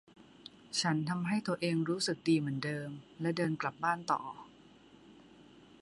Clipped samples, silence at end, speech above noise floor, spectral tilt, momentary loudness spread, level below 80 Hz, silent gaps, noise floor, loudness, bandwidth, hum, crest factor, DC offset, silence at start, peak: under 0.1%; 0.4 s; 25 dB; -5 dB/octave; 15 LU; -76 dBFS; none; -59 dBFS; -34 LUFS; 11.5 kHz; none; 18 dB; under 0.1%; 0.2 s; -18 dBFS